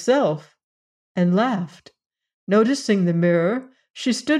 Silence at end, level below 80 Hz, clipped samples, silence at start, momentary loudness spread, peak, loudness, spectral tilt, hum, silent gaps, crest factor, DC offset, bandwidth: 0 s; -72 dBFS; under 0.1%; 0 s; 13 LU; -8 dBFS; -21 LUFS; -6 dB/octave; none; 0.64-1.15 s, 2.06-2.10 s, 2.34-2.47 s, 3.90-3.94 s; 14 dB; under 0.1%; 11 kHz